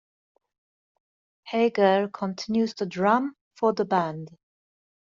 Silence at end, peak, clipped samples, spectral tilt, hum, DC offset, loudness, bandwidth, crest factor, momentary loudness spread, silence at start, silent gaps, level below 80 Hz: 0.75 s; -6 dBFS; under 0.1%; -4.5 dB/octave; none; under 0.1%; -25 LUFS; 7.6 kHz; 20 dB; 11 LU; 1.45 s; 3.41-3.51 s; -70 dBFS